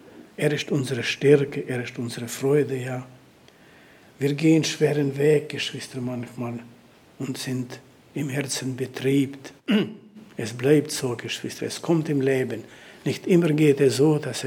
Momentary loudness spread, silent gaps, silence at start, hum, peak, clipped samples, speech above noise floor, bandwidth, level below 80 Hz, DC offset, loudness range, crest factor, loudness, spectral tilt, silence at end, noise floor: 14 LU; none; 0.05 s; none; -4 dBFS; under 0.1%; 29 dB; 17 kHz; -68 dBFS; under 0.1%; 5 LU; 20 dB; -24 LUFS; -5.5 dB/octave; 0 s; -53 dBFS